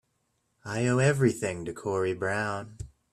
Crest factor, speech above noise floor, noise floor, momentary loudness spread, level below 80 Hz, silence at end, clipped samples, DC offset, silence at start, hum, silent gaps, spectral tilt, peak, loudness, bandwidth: 18 dB; 48 dB; -75 dBFS; 17 LU; -56 dBFS; 0.25 s; under 0.1%; under 0.1%; 0.65 s; none; none; -6 dB/octave; -10 dBFS; -28 LUFS; 13 kHz